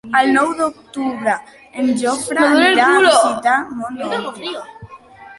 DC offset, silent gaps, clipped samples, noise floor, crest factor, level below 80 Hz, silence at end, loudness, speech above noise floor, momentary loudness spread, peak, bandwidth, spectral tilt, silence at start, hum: under 0.1%; none; under 0.1%; -40 dBFS; 16 dB; -58 dBFS; 0.05 s; -15 LUFS; 24 dB; 16 LU; 0 dBFS; 11.5 kHz; -2.5 dB/octave; 0.05 s; none